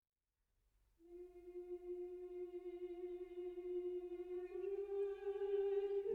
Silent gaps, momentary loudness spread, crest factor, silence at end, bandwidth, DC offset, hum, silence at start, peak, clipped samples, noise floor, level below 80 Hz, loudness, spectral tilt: none; 14 LU; 14 dB; 0 s; 4.2 kHz; under 0.1%; none; 1 s; -32 dBFS; under 0.1%; -87 dBFS; -74 dBFS; -46 LUFS; -7 dB/octave